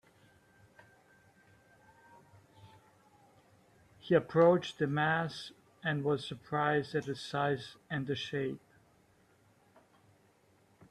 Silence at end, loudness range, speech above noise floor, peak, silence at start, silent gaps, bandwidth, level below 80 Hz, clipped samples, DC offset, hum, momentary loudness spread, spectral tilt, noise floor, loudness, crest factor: 2.35 s; 8 LU; 36 dB; -14 dBFS; 2.65 s; none; 12 kHz; -74 dBFS; under 0.1%; under 0.1%; none; 14 LU; -6.5 dB/octave; -68 dBFS; -33 LUFS; 22 dB